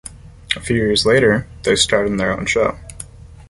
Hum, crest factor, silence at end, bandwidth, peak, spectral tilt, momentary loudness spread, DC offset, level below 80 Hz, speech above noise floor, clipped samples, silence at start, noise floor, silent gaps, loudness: none; 18 dB; 0.05 s; 11.5 kHz; 0 dBFS; -4 dB/octave; 21 LU; under 0.1%; -38 dBFS; 20 dB; under 0.1%; 0.05 s; -37 dBFS; none; -16 LUFS